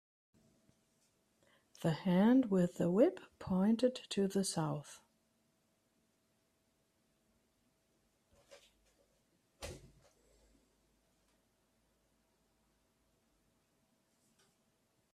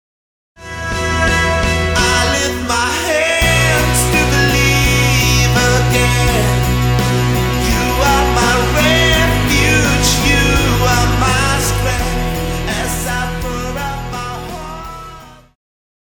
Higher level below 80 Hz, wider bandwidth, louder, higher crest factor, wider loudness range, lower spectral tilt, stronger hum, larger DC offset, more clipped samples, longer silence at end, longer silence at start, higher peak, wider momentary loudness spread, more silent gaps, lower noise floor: second, -72 dBFS vs -22 dBFS; second, 14.5 kHz vs over 20 kHz; second, -34 LUFS vs -13 LUFS; first, 22 dB vs 14 dB; about the same, 10 LU vs 8 LU; first, -6.5 dB/octave vs -4 dB/octave; neither; neither; neither; first, 5.35 s vs 0.7 s; first, 1.85 s vs 0.6 s; second, -18 dBFS vs 0 dBFS; first, 21 LU vs 11 LU; neither; first, -79 dBFS vs -36 dBFS